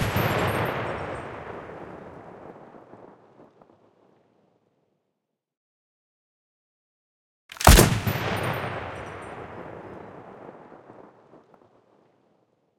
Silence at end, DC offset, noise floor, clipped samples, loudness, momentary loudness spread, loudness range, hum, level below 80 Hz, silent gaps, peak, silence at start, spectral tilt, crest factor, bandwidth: 1.8 s; under 0.1%; -81 dBFS; under 0.1%; -23 LUFS; 28 LU; 22 LU; none; -34 dBFS; 5.57-7.49 s; 0 dBFS; 0 s; -4 dB/octave; 28 dB; 16 kHz